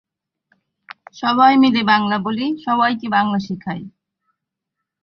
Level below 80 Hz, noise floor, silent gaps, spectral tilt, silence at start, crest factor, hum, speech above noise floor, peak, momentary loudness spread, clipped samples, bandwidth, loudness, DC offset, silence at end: -62 dBFS; -81 dBFS; none; -6.5 dB/octave; 1.15 s; 18 dB; none; 64 dB; 0 dBFS; 14 LU; under 0.1%; 6.4 kHz; -17 LUFS; under 0.1%; 1.15 s